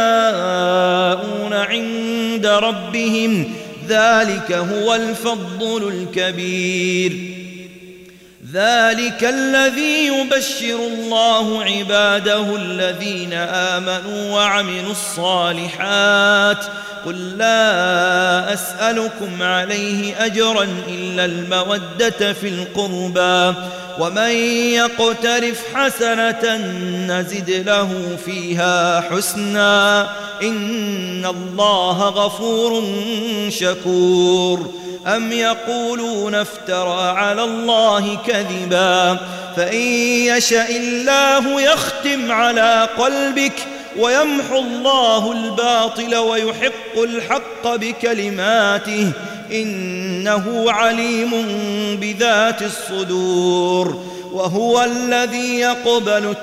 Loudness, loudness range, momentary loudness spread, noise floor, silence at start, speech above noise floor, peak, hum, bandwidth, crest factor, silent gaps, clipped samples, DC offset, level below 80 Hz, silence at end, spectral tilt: -17 LUFS; 3 LU; 9 LU; -42 dBFS; 0 s; 25 dB; -2 dBFS; none; 16 kHz; 14 dB; none; under 0.1%; under 0.1%; -60 dBFS; 0 s; -3.5 dB/octave